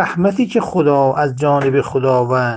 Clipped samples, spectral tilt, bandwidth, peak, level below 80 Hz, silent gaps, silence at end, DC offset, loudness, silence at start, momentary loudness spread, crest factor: under 0.1%; -7.5 dB/octave; 9.2 kHz; 0 dBFS; -52 dBFS; none; 0 s; under 0.1%; -15 LUFS; 0 s; 3 LU; 14 dB